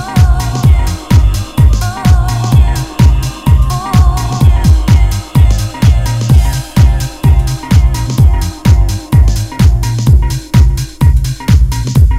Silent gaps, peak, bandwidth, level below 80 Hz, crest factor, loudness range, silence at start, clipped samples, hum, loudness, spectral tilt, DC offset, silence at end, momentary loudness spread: none; 0 dBFS; 16 kHz; -12 dBFS; 8 dB; 1 LU; 0 s; 4%; none; -11 LUFS; -6 dB/octave; under 0.1%; 0 s; 3 LU